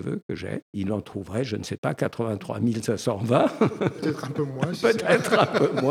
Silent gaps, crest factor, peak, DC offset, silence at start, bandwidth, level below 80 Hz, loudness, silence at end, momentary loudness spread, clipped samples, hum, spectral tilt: 0.23-0.29 s, 0.62-0.73 s, 1.78-1.83 s; 22 dB; -4 dBFS; under 0.1%; 0 s; 16 kHz; -62 dBFS; -25 LUFS; 0 s; 11 LU; under 0.1%; none; -6 dB/octave